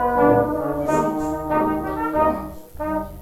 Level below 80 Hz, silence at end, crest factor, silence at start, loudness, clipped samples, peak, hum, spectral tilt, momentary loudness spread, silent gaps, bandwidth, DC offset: -40 dBFS; 0 s; 16 dB; 0 s; -21 LUFS; under 0.1%; -4 dBFS; none; -7.5 dB/octave; 10 LU; none; 16 kHz; under 0.1%